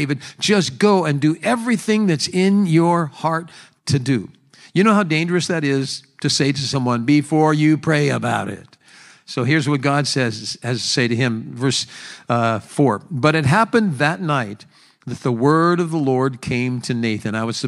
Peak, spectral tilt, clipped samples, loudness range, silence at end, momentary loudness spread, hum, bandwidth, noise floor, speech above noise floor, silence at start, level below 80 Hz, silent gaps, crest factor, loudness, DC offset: 0 dBFS; -5.5 dB/octave; under 0.1%; 3 LU; 0 s; 9 LU; none; 12 kHz; -47 dBFS; 29 dB; 0 s; -58 dBFS; none; 18 dB; -18 LUFS; under 0.1%